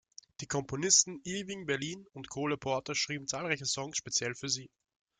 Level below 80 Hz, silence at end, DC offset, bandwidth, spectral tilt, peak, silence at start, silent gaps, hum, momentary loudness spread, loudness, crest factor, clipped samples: -68 dBFS; 0.55 s; under 0.1%; 11 kHz; -2 dB/octave; -10 dBFS; 0.4 s; none; none; 15 LU; -32 LUFS; 24 dB; under 0.1%